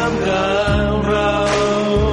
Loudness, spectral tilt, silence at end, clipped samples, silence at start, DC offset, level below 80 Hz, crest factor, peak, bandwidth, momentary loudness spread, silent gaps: -17 LUFS; -5.5 dB/octave; 0 s; under 0.1%; 0 s; under 0.1%; -28 dBFS; 10 dB; -6 dBFS; 11.5 kHz; 1 LU; none